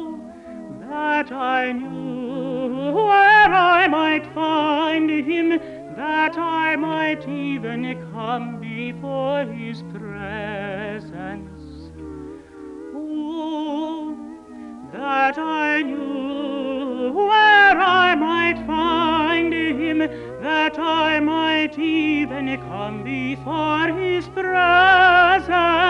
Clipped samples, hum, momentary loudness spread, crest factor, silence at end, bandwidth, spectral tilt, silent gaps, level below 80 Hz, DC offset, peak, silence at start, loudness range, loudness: under 0.1%; none; 21 LU; 16 dB; 0 s; 9.2 kHz; -5.5 dB/octave; none; -50 dBFS; under 0.1%; -4 dBFS; 0 s; 14 LU; -19 LUFS